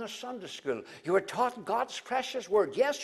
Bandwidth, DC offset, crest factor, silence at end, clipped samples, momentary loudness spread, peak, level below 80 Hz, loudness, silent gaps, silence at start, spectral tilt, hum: 13.5 kHz; under 0.1%; 16 dB; 0 s; under 0.1%; 10 LU; -14 dBFS; -74 dBFS; -32 LUFS; none; 0 s; -3.5 dB/octave; none